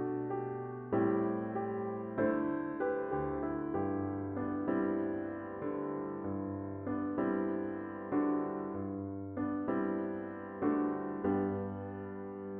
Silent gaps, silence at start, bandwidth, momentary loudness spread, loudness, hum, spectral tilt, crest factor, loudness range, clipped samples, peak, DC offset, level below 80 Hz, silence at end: none; 0 s; 3.4 kHz; 8 LU; -36 LUFS; none; -9 dB/octave; 16 dB; 2 LU; under 0.1%; -20 dBFS; under 0.1%; -64 dBFS; 0 s